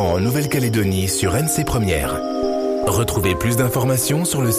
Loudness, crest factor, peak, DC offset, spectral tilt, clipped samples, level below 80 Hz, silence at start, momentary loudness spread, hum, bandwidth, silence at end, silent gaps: -19 LUFS; 12 dB; -6 dBFS; under 0.1%; -5 dB/octave; under 0.1%; -36 dBFS; 0 s; 3 LU; none; 15.5 kHz; 0 s; none